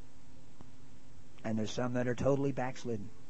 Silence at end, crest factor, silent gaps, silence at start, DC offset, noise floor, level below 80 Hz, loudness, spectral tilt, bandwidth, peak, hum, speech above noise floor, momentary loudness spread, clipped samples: 0.05 s; 20 dB; none; 0 s; 1%; -58 dBFS; -60 dBFS; -35 LUFS; -6.5 dB/octave; 8.4 kHz; -18 dBFS; none; 23 dB; 9 LU; under 0.1%